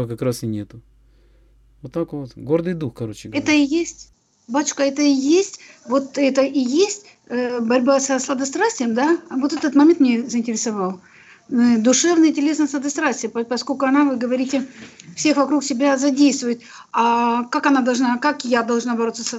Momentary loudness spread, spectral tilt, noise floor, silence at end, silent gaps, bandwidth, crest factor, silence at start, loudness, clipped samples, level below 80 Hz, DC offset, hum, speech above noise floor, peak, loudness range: 12 LU; -4 dB/octave; -53 dBFS; 0 s; none; 12 kHz; 14 dB; 0 s; -19 LUFS; under 0.1%; -60 dBFS; under 0.1%; none; 34 dB; -4 dBFS; 5 LU